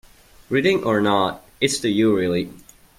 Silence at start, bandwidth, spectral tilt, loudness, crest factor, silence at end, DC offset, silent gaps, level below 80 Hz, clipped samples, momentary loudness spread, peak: 0.5 s; 16 kHz; -4.5 dB/octave; -20 LUFS; 18 dB; 0.4 s; under 0.1%; none; -54 dBFS; under 0.1%; 7 LU; -4 dBFS